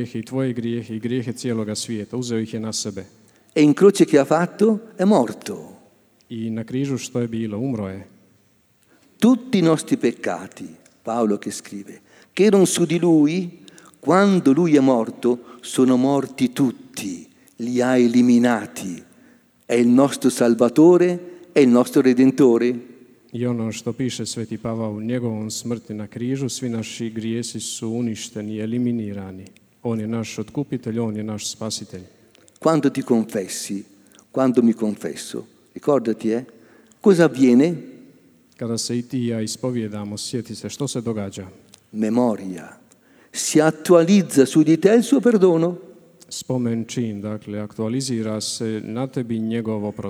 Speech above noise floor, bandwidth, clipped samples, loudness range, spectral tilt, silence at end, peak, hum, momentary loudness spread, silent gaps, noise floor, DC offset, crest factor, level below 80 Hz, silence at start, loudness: 40 dB; over 20 kHz; under 0.1%; 9 LU; -5.5 dB/octave; 0 s; -2 dBFS; none; 16 LU; none; -60 dBFS; under 0.1%; 20 dB; -66 dBFS; 0 s; -20 LUFS